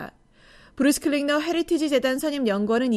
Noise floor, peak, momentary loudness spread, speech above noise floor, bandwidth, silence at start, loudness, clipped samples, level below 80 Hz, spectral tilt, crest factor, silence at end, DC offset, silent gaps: -54 dBFS; -8 dBFS; 3 LU; 31 dB; 15 kHz; 0 s; -23 LUFS; under 0.1%; -56 dBFS; -4 dB/octave; 16 dB; 0 s; under 0.1%; none